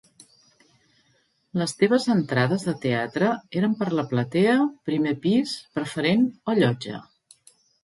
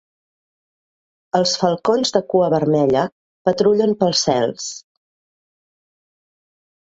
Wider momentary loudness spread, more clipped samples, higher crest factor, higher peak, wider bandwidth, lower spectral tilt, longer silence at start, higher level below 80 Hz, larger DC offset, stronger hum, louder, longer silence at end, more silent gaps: about the same, 9 LU vs 8 LU; neither; about the same, 18 dB vs 18 dB; second, -6 dBFS vs -2 dBFS; first, 11.5 kHz vs 8 kHz; first, -6 dB/octave vs -4.5 dB/octave; first, 1.55 s vs 1.35 s; second, -66 dBFS vs -60 dBFS; neither; neither; second, -24 LUFS vs -18 LUFS; second, 0.8 s vs 2.05 s; second, none vs 3.12-3.45 s